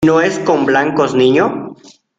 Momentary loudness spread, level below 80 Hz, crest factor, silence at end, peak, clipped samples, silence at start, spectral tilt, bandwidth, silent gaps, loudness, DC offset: 10 LU; -50 dBFS; 12 dB; 0.45 s; 0 dBFS; under 0.1%; 0 s; -5.5 dB/octave; 8 kHz; none; -13 LUFS; under 0.1%